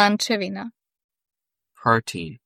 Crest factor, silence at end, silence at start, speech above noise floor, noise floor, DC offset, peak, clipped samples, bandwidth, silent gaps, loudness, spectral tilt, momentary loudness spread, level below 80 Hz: 22 dB; 0.1 s; 0 s; 46 dB; -68 dBFS; under 0.1%; -2 dBFS; under 0.1%; 15.5 kHz; 1.04-1.09 s; -23 LUFS; -4 dB/octave; 14 LU; -62 dBFS